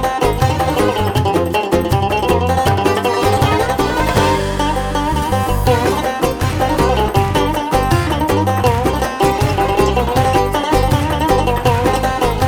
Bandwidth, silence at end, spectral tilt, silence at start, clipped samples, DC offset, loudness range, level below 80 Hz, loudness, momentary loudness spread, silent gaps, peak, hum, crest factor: over 20 kHz; 0 s; -5.5 dB/octave; 0 s; under 0.1%; under 0.1%; 1 LU; -26 dBFS; -15 LUFS; 3 LU; none; 0 dBFS; none; 14 dB